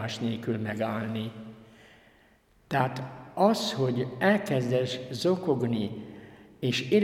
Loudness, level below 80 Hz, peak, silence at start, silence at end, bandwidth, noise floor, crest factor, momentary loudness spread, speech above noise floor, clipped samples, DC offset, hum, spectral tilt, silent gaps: -29 LUFS; -66 dBFS; -8 dBFS; 0 s; 0 s; 16 kHz; -62 dBFS; 20 dB; 14 LU; 34 dB; under 0.1%; under 0.1%; none; -6 dB/octave; none